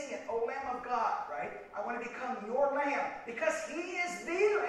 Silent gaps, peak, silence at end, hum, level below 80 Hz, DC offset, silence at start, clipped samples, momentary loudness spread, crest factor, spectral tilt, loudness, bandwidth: none; -18 dBFS; 0 s; none; -70 dBFS; under 0.1%; 0 s; under 0.1%; 8 LU; 18 dB; -3.5 dB/octave; -35 LUFS; 12.5 kHz